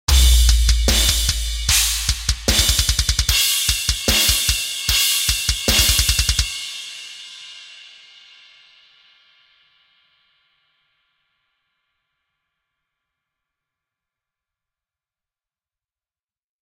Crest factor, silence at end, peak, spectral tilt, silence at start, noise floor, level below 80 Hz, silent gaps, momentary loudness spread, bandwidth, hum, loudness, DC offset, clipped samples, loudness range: 20 dB; 8.8 s; 0 dBFS; -1.5 dB/octave; 0.1 s; under -90 dBFS; -24 dBFS; none; 17 LU; 16.5 kHz; none; -16 LUFS; under 0.1%; under 0.1%; 11 LU